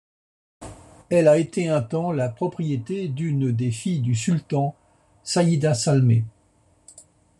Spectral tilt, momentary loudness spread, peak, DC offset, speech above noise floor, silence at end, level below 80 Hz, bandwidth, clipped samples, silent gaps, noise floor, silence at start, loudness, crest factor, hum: -6.5 dB/octave; 10 LU; -6 dBFS; under 0.1%; 39 dB; 1.1 s; -58 dBFS; 11.5 kHz; under 0.1%; none; -60 dBFS; 0.6 s; -22 LUFS; 18 dB; none